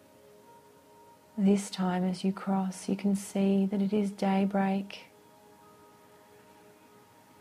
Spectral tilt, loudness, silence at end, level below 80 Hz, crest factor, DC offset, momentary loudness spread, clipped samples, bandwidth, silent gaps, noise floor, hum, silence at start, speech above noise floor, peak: -6.5 dB/octave; -29 LUFS; 2.35 s; -72 dBFS; 18 dB; under 0.1%; 6 LU; under 0.1%; 14 kHz; none; -58 dBFS; none; 1.35 s; 29 dB; -14 dBFS